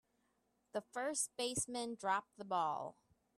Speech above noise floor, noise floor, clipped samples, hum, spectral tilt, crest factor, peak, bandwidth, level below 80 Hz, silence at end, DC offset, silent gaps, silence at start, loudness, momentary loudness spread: 40 dB; -81 dBFS; under 0.1%; none; -2 dB/octave; 18 dB; -24 dBFS; 14.5 kHz; -74 dBFS; 0.45 s; under 0.1%; none; 0.75 s; -40 LUFS; 8 LU